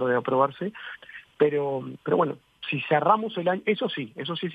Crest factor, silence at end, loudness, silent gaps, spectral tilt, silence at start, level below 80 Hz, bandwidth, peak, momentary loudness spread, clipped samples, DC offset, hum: 20 dB; 0 s; -26 LUFS; none; -8 dB/octave; 0 s; -72 dBFS; 5 kHz; -6 dBFS; 13 LU; under 0.1%; under 0.1%; none